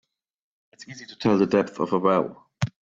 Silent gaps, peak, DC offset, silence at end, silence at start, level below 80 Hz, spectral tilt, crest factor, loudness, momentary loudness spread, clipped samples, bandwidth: none; -6 dBFS; under 0.1%; 0.15 s; 0.8 s; -62 dBFS; -7 dB/octave; 18 dB; -23 LUFS; 20 LU; under 0.1%; 7.8 kHz